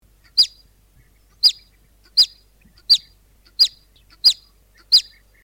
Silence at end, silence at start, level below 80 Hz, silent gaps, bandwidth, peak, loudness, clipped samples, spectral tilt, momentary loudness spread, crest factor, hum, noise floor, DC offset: 0.4 s; 0.35 s; -56 dBFS; none; 17 kHz; -4 dBFS; -16 LUFS; under 0.1%; 2 dB/octave; 5 LU; 18 dB; none; -54 dBFS; under 0.1%